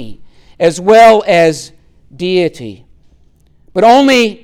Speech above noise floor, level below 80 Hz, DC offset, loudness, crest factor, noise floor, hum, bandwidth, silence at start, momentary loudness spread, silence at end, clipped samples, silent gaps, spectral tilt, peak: 39 dB; -46 dBFS; under 0.1%; -9 LUFS; 12 dB; -47 dBFS; none; 16 kHz; 0 s; 17 LU; 0.1 s; under 0.1%; none; -4.5 dB/octave; 0 dBFS